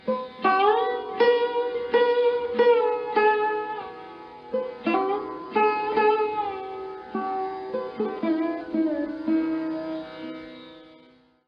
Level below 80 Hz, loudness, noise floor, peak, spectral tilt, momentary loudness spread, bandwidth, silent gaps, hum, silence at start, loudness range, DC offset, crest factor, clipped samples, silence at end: -66 dBFS; -25 LUFS; -56 dBFS; -8 dBFS; -7 dB/octave; 15 LU; 5.6 kHz; none; none; 0.05 s; 6 LU; under 0.1%; 16 dB; under 0.1%; 0.6 s